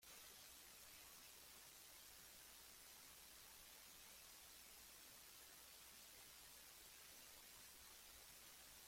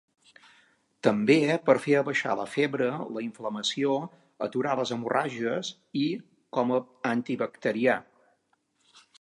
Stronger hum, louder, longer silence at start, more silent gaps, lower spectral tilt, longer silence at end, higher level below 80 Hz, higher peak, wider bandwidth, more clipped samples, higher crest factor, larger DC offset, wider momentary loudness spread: neither; second, -61 LUFS vs -28 LUFS; second, 0 s vs 1.05 s; neither; second, 0 dB/octave vs -5 dB/octave; second, 0 s vs 1.2 s; about the same, -80 dBFS vs -78 dBFS; second, -48 dBFS vs -6 dBFS; first, 16.5 kHz vs 11.5 kHz; neither; second, 14 dB vs 22 dB; neither; second, 1 LU vs 11 LU